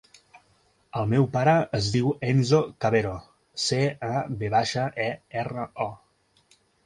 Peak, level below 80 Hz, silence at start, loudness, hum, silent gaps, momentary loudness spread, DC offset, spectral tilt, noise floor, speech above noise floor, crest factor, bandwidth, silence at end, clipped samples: -8 dBFS; -54 dBFS; 0.35 s; -25 LUFS; none; none; 11 LU; under 0.1%; -5.5 dB/octave; -64 dBFS; 40 dB; 18 dB; 11.5 kHz; 0.9 s; under 0.1%